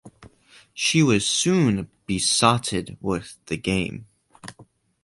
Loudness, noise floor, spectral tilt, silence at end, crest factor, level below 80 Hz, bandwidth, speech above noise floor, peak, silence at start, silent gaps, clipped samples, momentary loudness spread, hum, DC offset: -22 LUFS; -54 dBFS; -4 dB/octave; 0.4 s; 22 dB; -50 dBFS; 11.5 kHz; 31 dB; -2 dBFS; 0.05 s; none; under 0.1%; 23 LU; none; under 0.1%